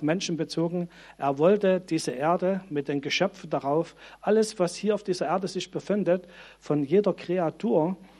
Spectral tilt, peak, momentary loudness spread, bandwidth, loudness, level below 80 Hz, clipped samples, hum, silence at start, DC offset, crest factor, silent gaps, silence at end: -5.5 dB/octave; -10 dBFS; 7 LU; 12.5 kHz; -27 LUFS; -66 dBFS; under 0.1%; none; 0 s; under 0.1%; 18 dB; none; 0.15 s